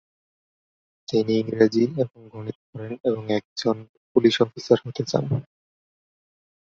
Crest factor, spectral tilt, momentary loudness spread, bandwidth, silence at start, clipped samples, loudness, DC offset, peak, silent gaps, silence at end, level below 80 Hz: 22 dB; -6.5 dB/octave; 16 LU; 7.6 kHz; 1.1 s; under 0.1%; -23 LUFS; under 0.1%; -4 dBFS; 2.55-2.73 s, 3.00-3.04 s, 3.45-3.56 s, 3.89-4.15 s; 1.25 s; -62 dBFS